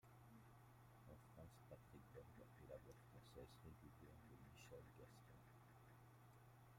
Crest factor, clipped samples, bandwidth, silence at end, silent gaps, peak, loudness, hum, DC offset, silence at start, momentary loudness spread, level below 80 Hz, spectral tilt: 18 dB; under 0.1%; 16 kHz; 0 s; none; -46 dBFS; -66 LUFS; none; under 0.1%; 0 s; 6 LU; -76 dBFS; -6 dB/octave